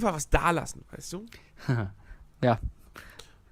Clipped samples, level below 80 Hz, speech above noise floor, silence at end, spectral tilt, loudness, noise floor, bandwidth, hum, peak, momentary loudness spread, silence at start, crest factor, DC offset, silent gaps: under 0.1%; -38 dBFS; 22 dB; 0.3 s; -5.5 dB/octave; -30 LUFS; -51 dBFS; 16 kHz; none; -6 dBFS; 23 LU; 0 s; 24 dB; under 0.1%; none